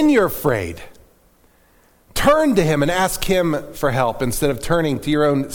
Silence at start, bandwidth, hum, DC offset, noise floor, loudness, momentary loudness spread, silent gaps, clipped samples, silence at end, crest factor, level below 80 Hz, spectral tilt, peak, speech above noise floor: 0 s; 19 kHz; none; under 0.1%; -55 dBFS; -18 LUFS; 7 LU; none; under 0.1%; 0 s; 16 dB; -36 dBFS; -5 dB/octave; -2 dBFS; 37 dB